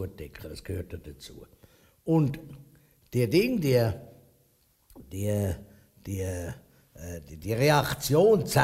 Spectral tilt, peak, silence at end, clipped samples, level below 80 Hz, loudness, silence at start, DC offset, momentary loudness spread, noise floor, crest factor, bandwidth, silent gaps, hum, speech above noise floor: -6 dB/octave; -8 dBFS; 0 s; under 0.1%; -52 dBFS; -27 LUFS; 0 s; under 0.1%; 21 LU; -66 dBFS; 20 dB; 16 kHz; none; none; 39 dB